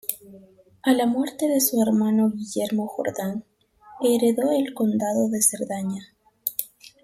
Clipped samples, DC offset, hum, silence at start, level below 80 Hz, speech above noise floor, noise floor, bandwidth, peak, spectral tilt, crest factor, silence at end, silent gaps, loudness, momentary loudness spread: under 0.1%; under 0.1%; none; 0.05 s; -68 dBFS; 29 dB; -51 dBFS; 16.5 kHz; -4 dBFS; -4.5 dB/octave; 20 dB; 0.15 s; none; -23 LUFS; 11 LU